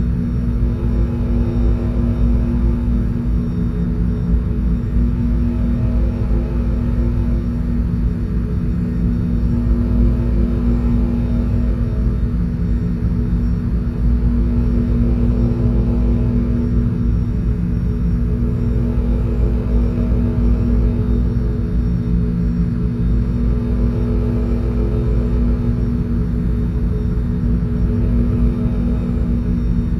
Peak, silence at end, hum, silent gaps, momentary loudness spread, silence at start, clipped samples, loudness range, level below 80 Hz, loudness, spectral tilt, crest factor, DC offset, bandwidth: -4 dBFS; 0 s; none; none; 3 LU; 0 s; under 0.1%; 1 LU; -18 dBFS; -19 LUFS; -10.5 dB/octave; 12 dB; under 0.1%; 4.6 kHz